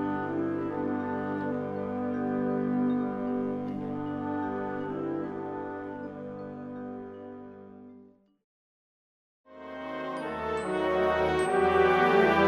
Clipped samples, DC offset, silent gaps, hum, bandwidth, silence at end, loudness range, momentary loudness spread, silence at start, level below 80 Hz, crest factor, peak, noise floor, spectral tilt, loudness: under 0.1%; under 0.1%; 8.44-9.44 s; 50 Hz at -55 dBFS; 12 kHz; 0 s; 15 LU; 17 LU; 0 s; -58 dBFS; 18 dB; -12 dBFS; -56 dBFS; -6.5 dB/octave; -30 LUFS